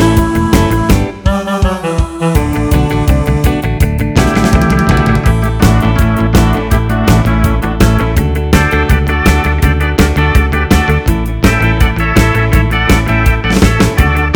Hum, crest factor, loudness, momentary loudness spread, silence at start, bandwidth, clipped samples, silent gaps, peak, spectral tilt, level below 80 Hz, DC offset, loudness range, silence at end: none; 10 dB; -11 LUFS; 3 LU; 0 s; over 20 kHz; 0.6%; none; 0 dBFS; -6 dB/octave; -14 dBFS; 0.5%; 2 LU; 0 s